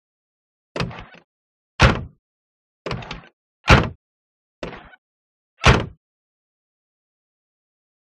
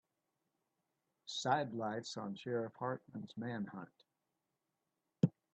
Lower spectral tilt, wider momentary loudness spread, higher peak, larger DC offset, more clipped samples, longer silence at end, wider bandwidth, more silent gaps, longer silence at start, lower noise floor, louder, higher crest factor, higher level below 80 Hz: about the same, -5 dB/octave vs -5.5 dB/octave; first, 23 LU vs 13 LU; first, 0 dBFS vs -18 dBFS; neither; neither; first, 2.3 s vs 0.25 s; first, 11.5 kHz vs 8.6 kHz; first, 1.24-1.79 s, 2.19-2.85 s, 3.33-3.64 s, 3.95-4.62 s, 4.98-5.57 s vs none; second, 0.75 s vs 1.25 s; about the same, under -90 dBFS vs -88 dBFS; first, -19 LUFS vs -41 LUFS; about the same, 24 dB vs 26 dB; first, -32 dBFS vs -84 dBFS